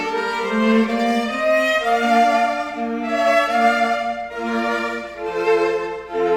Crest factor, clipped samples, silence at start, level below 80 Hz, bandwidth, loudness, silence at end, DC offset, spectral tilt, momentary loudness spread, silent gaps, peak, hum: 14 dB; under 0.1%; 0 s; -54 dBFS; 16.5 kHz; -19 LUFS; 0 s; under 0.1%; -4.5 dB/octave; 9 LU; none; -6 dBFS; none